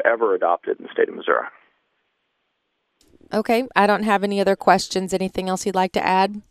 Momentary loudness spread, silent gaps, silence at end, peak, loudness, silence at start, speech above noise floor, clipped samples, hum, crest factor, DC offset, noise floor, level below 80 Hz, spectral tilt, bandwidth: 7 LU; none; 0.1 s; 0 dBFS; -20 LUFS; 0 s; 53 dB; under 0.1%; none; 20 dB; under 0.1%; -73 dBFS; -58 dBFS; -4.5 dB/octave; 15 kHz